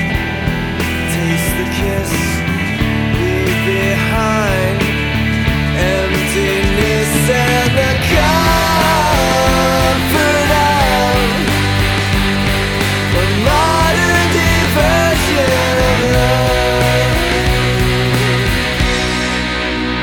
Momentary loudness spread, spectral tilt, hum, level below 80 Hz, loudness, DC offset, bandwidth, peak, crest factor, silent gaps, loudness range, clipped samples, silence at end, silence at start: 5 LU; -4.5 dB/octave; none; -24 dBFS; -13 LUFS; under 0.1%; 19.5 kHz; 0 dBFS; 14 dB; none; 3 LU; under 0.1%; 0 s; 0 s